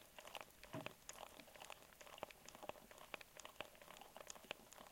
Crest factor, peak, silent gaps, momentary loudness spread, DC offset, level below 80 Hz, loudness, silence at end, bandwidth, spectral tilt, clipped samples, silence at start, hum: 30 dB; -28 dBFS; none; 5 LU; under 0.1%; -78 dBFS; -56 LUFS; 0 s; 17 kHz; -2.5 dB/octave; under 0.1%; 0 s; none